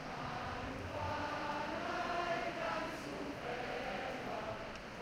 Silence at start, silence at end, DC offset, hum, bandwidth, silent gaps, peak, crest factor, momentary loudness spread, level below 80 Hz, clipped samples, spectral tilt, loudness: 0 s; 0 s; under 0.1%; none; 16 kHz; none; -26 dBFS; 16 dB; 5 LU; -60 dBFS; under 0.1%; -5 dB/octave; -41 LUFS